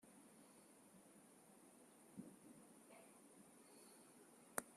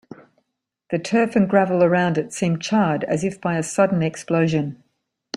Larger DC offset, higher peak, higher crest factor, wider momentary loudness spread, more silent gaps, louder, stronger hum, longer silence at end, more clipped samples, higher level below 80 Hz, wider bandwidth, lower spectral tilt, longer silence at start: neither; second, -22 dBFS vs -4 dBFS; first, 40 dB vs 18 dB; about the same, 6 LU vs 7 LU; neither; second, -62 LUFS vs -20 LUFS; neither; about the same, 0 s vs 0 s; neither; second, under -90 dBFS vs -60 dBFS; first, 14 kHz vs 11.5 kHz; second, -3 dB/octave vs -6 dB/octave; about the same, 0 s vs 0.1 s